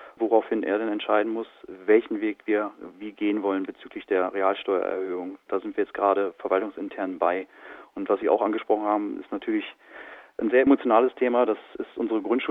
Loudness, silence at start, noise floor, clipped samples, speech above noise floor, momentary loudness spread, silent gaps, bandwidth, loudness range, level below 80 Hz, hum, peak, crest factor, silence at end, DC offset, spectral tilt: -25 LUFS; 0 s; -45 dBFS; under 0.1%; 20 dB; 15 LU; none; 4 kHz; 3 LU; -68 dBFS; none; -6 dBFS; 18 dB; 0 s; under 0.1%; -7.5 dB/octave